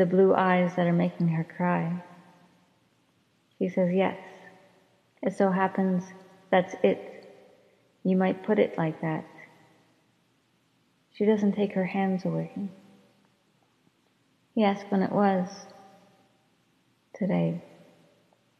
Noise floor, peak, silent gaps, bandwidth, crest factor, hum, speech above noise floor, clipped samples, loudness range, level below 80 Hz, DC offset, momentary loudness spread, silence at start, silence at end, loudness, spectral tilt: -68 dBFS; -8 dBFS; none; 7 kHz; 20 dB; none; 43 dB; under 0.1%; 4 LU; -78 dBFS; under 0.1%; 13 LU; 0 s; 1 s; -27 LUFS; -8 dB/octave